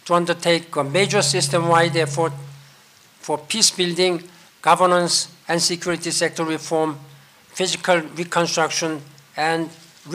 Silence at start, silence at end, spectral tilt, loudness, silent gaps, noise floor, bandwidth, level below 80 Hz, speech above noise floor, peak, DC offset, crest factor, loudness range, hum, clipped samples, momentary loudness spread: 0.05 s; 0 s; -3 dB/octave; -20 LUFS; none; -51 dBFS; 16 kHz; -68 dBFS; 31 dB; -2 dBFS; under 0.1%; 18 dB; 3 LU; none; under 0.1%; 11 LU